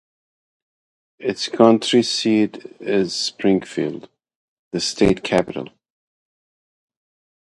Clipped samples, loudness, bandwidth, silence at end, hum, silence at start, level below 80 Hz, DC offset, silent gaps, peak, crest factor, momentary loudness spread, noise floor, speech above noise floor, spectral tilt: under 0.1%; -19 LUFS; 11.5 kHz; 1.75 s; none; 1.2 s; -50 dBFS; under 0.1%; 4.35-4.71 s; 0 dBFS; 22 dB; 15 LU; under -90 dBFS; over 71 dB; -4.5 dB/octave